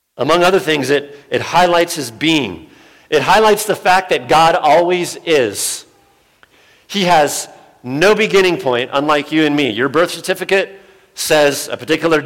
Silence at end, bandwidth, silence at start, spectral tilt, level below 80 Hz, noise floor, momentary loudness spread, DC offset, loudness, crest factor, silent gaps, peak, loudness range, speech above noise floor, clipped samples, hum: 0 s; 17 kHz; 0.2 s; -3.5 dB/octave; -48 dBFS; -53 dBFS; 11 LU; under 0.1%; -14 LUFS; 12 dB; none; -2 dBFS; 3 LU; 39 dB; under 0.1%; none